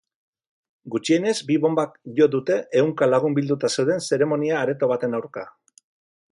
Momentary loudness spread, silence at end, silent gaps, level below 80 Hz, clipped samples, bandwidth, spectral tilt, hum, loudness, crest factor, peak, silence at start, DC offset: 9 LU; 0.8 s; none; -70 dBFS; under 0.1%; 11.5 kHz; -5.5 dB/octave; none; -22 LUFS; 16 dB; -6 dBFS; 0.85 s; under 0.1%